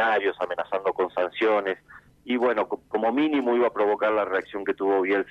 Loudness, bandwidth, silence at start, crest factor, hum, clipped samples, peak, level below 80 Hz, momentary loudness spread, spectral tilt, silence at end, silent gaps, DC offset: -25 LUFS; 6.6 kHz; 0 s; 12 dB; none; under 0.1%; -12 dBFS; -66 dBFS; 7 LU; -6 dB/octave; 0 s; none; under 0.1%